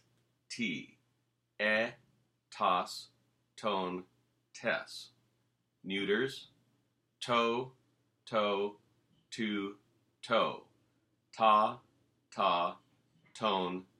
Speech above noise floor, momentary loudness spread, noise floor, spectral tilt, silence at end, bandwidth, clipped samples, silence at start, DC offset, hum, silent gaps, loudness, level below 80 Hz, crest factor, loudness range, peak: 46 dB; 17 LU; -79 dBFS; -4 dB/octave; 0.15 s; 13.5 kHz; under 0.1%; 0.5 s; under 0.1%; none; none; -34 LUFS; -82 dBFS; 24 dB; 5 LU; -14 dBFS